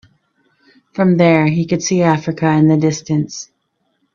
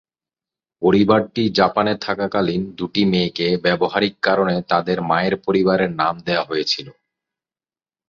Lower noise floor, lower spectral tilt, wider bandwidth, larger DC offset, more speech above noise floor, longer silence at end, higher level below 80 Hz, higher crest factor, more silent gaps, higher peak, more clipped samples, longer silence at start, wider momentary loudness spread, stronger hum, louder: second, -67 dBFS vs under -90 dBFS; about the same, -6 dB/octave vs -6.5 dB/octave; about the same, 7.4 kHz vs 7.2 kHz; neither; second, 53 dB vs over 72 dB; second, 0.7 s vs 1.15 s; about the same, -54 dBFS vs -52 dBFS; about the same, 16 dB vs 18 dB; neither; about the same, 0 dBFS vs -2 dBFS; neither; first, 0.95 s vs 0.8 s; first, 15 LU vs 5 LU; neither; first, -14 LUFS vs -19 LUFS